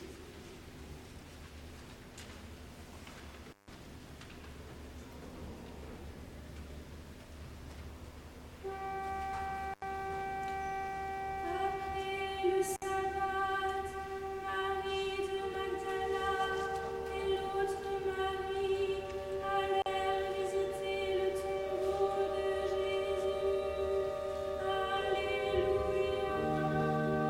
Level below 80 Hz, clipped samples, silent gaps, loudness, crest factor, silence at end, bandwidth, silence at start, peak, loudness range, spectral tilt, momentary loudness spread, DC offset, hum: -54 dBFS; under 0.1%; none; -35 LUFS; 16 dB; 0 s; 16.5 kHz; 0 s; -20 dBFS; 16 LU; -5 dB/octave; 18 LU; under 0.1%; none